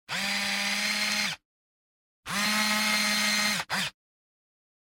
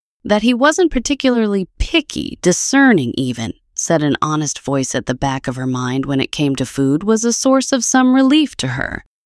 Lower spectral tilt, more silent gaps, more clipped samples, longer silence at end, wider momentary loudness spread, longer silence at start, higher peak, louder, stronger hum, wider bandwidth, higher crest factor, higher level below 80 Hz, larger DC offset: second, -1 dB/octave vs -4 dB/octave; first, 1.45-2.23 s vs none; neither; first, 0.95 s vs 0.25 s; about the same, 9 LU vs 9 LU; second, 0.1 s vs 0.25 s; second, -14 dBFS vs 0 dBFS; second, -26 LUFS vs -16 LUFS; neither; first, 17 kHz vs 12 kHz; about the same, 16 dB vs 14 dB; second, -66 dBFS vs -36 dBFS; neither